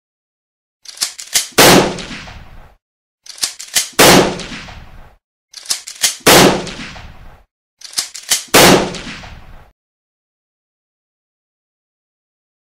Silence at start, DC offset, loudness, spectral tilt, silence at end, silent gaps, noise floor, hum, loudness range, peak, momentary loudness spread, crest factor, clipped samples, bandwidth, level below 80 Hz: 1 s; under 0.1%; -11 LUFS; -2.5 dB/octave; 3.05 s; 2.82-3.18 s, 5.24-5.48 s, 7.51-7.77 s; -37 dBFS; none; 3 LU; 0 dBFS; 22 LU; 16 dB; 0.2%; over 20 kHz; -40 dBFS